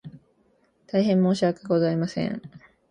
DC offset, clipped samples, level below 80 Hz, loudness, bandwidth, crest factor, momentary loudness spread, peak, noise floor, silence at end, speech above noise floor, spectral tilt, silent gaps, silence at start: under 0.1%; under 0.1%; -64 dBFS; -24 LUFS; 9.8 kHz; 16 dB; 9 LU; -10 dBFS; -65 dBFS; 0.35 s; 42 dB; -7.5 dB/octave; none; 0.05 s